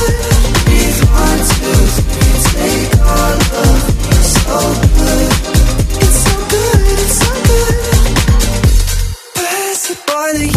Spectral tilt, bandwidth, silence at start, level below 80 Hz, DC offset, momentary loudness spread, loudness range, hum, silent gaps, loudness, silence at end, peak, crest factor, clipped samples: -4.5 dB/octave; 15.5 kHz; 0 s; -14 dBFS; under 0.1%; 4 LU; 1 LU; none; none; -12 LUFS; 0 s; 0 dBFS; 10 dB; 0.2%